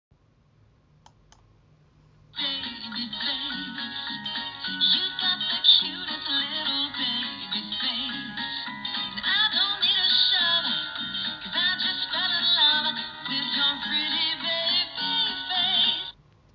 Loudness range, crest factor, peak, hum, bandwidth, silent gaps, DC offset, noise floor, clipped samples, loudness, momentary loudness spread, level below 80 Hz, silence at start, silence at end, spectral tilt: 9 LU; 20 dB; -6 dBFS; none; 6.8 kHz; none; under 0.1%; -61 dBFS; under 0.1%; -23 LUFS; 12 LU; -64 dBFS; 2.35 s; 0.45 s; -4 dB/octave